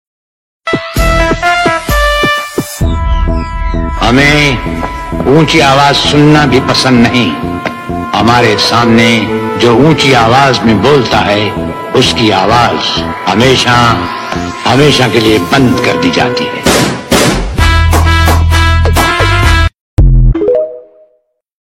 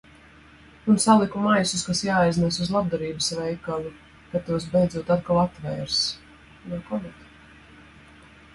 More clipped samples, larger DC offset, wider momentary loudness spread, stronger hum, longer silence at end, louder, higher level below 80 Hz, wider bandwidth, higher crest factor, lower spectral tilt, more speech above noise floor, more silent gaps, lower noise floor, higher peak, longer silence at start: first, 0.2% vs under 0.1%; neither; second, 9 LU vs 13 LU; neither; second, 0.75 s vs 1.4 s; first, -8 LUFS vs -24 LUFS; first, -18 dBFS vs -52 dBFS; first, 16.5 kHz vs 11.5 kHz; second, 8 dB vs 20 dB; about the same, -5 dB/octave vs -4.5 dB/octave; first, 48 dB vs 27 dB; first, 19.80-19.97 s vs none; first, -55 dBFS vs -50 dBFS; first, 0 dBFS vs -4 dBFS; second, 0.65 s vs 0.85 s